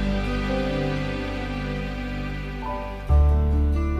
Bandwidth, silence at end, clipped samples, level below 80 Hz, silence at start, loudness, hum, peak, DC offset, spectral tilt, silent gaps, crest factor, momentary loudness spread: 7.4 kHz; 0 s; under 0.1%; -26 dBFS; 0 s; -25 LUFS; 50 Hz at -35 dBFS; -10 dBFS; under 0.1%; -7.5 dB/octave; none; 14 dB; 10 LU